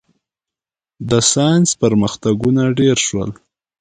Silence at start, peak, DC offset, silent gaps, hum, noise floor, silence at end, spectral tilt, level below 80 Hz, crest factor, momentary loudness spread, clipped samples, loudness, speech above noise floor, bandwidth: 1 s; 0 dBFS; under 0.1%; none; none; -89 dBFS; 0.5 s; -4.5 dB/octave; -46 dBFS; 16 dB; 9 LU; under 0.1%; -15 LUFS; 74 dB; 9.6 kHz